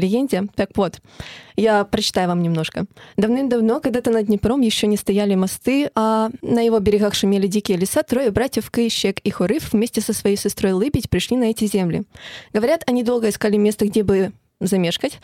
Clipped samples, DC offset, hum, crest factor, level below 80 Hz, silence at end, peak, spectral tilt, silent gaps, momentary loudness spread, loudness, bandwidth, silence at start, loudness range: under 0.1%; under 0.1%; none; 16 dB; -46 dBFS; 0.05 s; -2 dBFS; -5 dB/octave; none; 6 LU; -19 LUFS; 16.5 kHz; 0 s; 2 LU